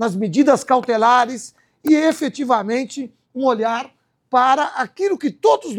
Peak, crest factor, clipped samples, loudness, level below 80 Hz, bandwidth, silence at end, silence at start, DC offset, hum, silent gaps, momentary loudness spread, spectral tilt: -2 dBFS; 16 dB; under 0.1%; -18 LUFS; -70 dBFS; 19 kHz; 0 s; 0 s; under 0.1%; none; none; 14 LU; -5 dB/octave